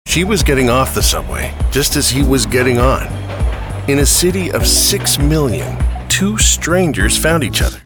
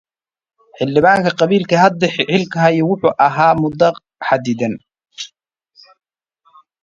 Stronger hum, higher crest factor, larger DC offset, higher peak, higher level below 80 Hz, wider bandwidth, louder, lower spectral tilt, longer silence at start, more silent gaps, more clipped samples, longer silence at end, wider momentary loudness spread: neither; about the same, 14 dB vs 16 dB; neither; about the same, 0 dBFS vs 0 dBFS; first, -20 dBFS vs -54 dBFS; first, 19.5 kHz vs 9.8 kHz; about the same, -13 LUFS vs -15 LUFS; second, -3.5 dB/octave vs -6 dB/octave; second, 0.05 s vs 0.8 s; neither; neither; second, 0.05 s vs 1.55 s; second, 9 LU vs 15 LU